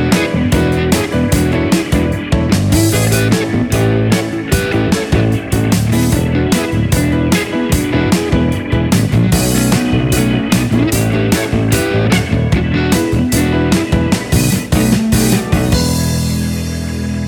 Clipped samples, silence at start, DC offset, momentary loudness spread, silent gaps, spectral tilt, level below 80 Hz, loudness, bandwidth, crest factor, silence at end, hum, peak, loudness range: under 0.1%; 0 s; under 0.1%; 3 LU; none; -5.5 dB/octave; -24 dBFS; -13 LUFS; 19 kHz; 12 dB; 0 s; none; 0 dBFS; 1 LU